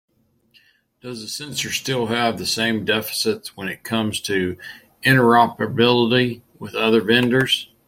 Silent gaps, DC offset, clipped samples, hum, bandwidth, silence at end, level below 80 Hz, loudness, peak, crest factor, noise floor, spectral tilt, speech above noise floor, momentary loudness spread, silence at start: none; under 0.1%; under 0.1%; none; 16.5 kHz; 0.25 s; -58 dBFS; -19 LUFS; -2 dBFS; 18 dB; -59 dBFS; -4.5 dB/octave; 39 dB; 14 LU; 1.05 s